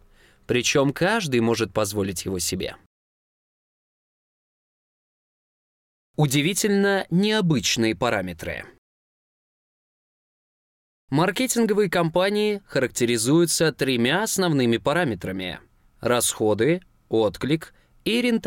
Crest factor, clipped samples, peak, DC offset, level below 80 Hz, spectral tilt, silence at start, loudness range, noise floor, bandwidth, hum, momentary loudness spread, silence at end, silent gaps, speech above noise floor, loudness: 14 dB; under 0.1%; -10 dBFS; under 0.1%; -54 dBFS; -4.5 dB/octave; 0.5 s; 10 LU; under -90 dBFS; 17 kHz; none; 9 LU; 0 s; 2.86-6.14 s, 8.78-11.08 s; over 68 dB; -22 LUFS